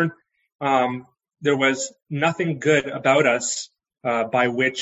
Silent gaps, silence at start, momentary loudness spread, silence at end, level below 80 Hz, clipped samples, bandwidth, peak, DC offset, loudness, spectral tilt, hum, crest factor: 0.55-0.59 s; 0 s; 11 LU; 0 s; -68 dBFS; under 0.1%; 8.8 kHz; -4 dBFS; under 0.1%; -21 LUFS; -4 dB/octave; none; 18 dB